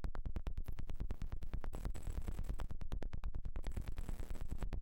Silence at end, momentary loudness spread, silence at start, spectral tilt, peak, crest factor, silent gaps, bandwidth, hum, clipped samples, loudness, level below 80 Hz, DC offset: 0 s; 2 LU; 0 s; -6.5 dB/octave; -32 dBFS; 6 dB; none; 15 kHz; none; under 0.1%; -48 LUFS; -42 dBFS; under 0.1%